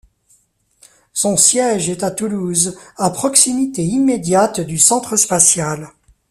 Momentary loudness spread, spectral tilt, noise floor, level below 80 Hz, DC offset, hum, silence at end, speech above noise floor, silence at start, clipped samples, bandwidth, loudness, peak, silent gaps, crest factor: 10 LU; -3 dB/octave; -58 dBFS; -54 dBFS; under 0.1%; none; 0.4 s; 43 dB; 1.15 s; under 0.1%; 16 kHz; -14 LUFS; 0 dBFS; none; 16 dB